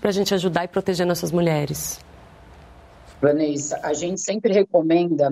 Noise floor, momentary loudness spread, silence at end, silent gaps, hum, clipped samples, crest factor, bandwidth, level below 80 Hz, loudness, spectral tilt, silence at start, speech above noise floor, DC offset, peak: -46 dBFS; 7 LU; 0 s; none; none; under 0.1%; 16 dB; 16 kHz; -52 dBFS; -21 LUFS; -5 dB/octave; 0 s; 25 dB; under 0.1%; -6 dBFS